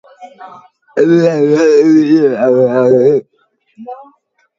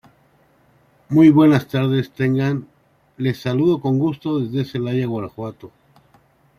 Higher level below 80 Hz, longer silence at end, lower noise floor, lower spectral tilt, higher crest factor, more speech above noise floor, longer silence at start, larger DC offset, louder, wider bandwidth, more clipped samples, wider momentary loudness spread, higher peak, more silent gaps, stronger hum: about the same, -62 dBFS vs -58 dBFS; second, 0.55 s vs 0.9 s; about the same, -54 dBFS vs -57 dBFS; about the same, -7.5 dB/octave vs -8.5 dB/octave; second, 12 dB vs 18 dB; first, 44 dB vs 39 dB; second, 0.2 s vs 1.1 s; neither; first, -10 LUFS vs -18 LUFS; second, 7.6 kHz vs 14.5 kHz; neither; about the same, 15 LU vs 14 LU; about the same, 0 dBFS vs -2 dBFS; neither; neither